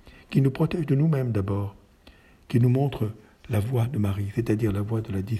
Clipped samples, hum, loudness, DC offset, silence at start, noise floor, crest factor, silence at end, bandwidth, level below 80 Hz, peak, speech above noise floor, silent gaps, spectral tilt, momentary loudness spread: under 0.1%; none; -25 LUFS; under 0.1%; 0.05 s; -54 dBFS; 16 dB; 0 s; 13.5 kHz; -52 dBFS; -10 dBFS; 30 dB; none; -8.5 dB/octave; 8 LU